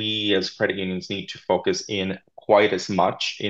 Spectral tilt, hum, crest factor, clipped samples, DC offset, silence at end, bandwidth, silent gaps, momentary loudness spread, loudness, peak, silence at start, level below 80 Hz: -4 dB/octave; none; 20 dB; under 0.1%; under 0.1%; 0 s; 8.4 kHz; none; 12 LU; -23 LUFS; -4 dBFS; 0 s; -66 dBFS